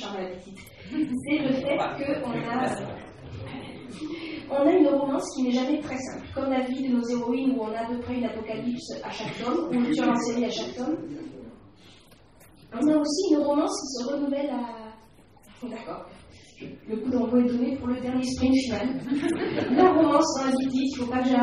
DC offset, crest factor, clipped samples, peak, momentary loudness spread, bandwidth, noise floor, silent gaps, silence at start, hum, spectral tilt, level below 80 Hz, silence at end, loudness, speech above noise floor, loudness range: under 0.1%; 22 dB; under 0.1%; -6 dBFS; 17 LU; 11.5 kHz; -54 dBFS; none; 0 s; none; -5 dB/octave; -56 dBFS; 0 s; -26 LUFS; 29 dB; 6 LU